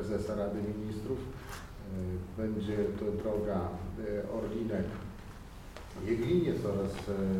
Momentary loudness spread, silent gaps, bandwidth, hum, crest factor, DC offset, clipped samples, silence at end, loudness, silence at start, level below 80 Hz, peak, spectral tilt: 14 LU; none; 16 kHz; none; 16 dB; under 0.1%; under 0.1%; 0 s; -35 LUFS; 0 s; -50 dBFS; -18 dBFS; -7.5 dB/octave